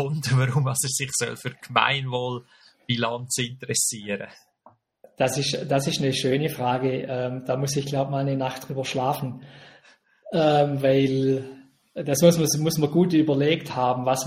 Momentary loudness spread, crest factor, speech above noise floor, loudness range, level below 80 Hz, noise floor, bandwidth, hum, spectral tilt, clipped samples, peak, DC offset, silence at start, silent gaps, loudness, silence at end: 10 LU; 22 dB; 34 dB; 6 LU; -62 dBFS; -58 dBFS; 16 kHz; none; -4.5 dB/octave; under 0.1%; -2 dBFS; under 0.1%; 0 s; none; -24 LUFS; 0 s